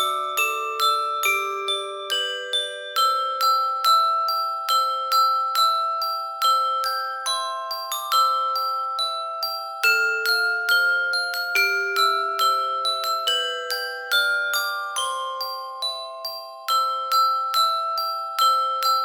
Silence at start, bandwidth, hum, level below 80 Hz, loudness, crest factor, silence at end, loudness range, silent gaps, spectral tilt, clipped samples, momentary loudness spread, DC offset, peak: 0 s; over 20 kHz; none; -72 dBFS; -22 LUFS; 18 dB; 0 s; 3 LU; none; 2 dB/octave; under 0.1%; 8 LU; under 0.1%; -6 dBFS